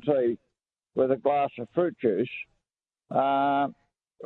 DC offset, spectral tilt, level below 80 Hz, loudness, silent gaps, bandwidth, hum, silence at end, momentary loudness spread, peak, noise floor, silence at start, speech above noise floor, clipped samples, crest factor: under 0.1%; -9.5 dB/octave; -74 dBFS; -27 LUFS; none; 4.2 kHz; none; 0 s; 11 LU; -10 dBFS; -89 dBFS; 0.05 s; 63 dB; under 0.1%; 16 dB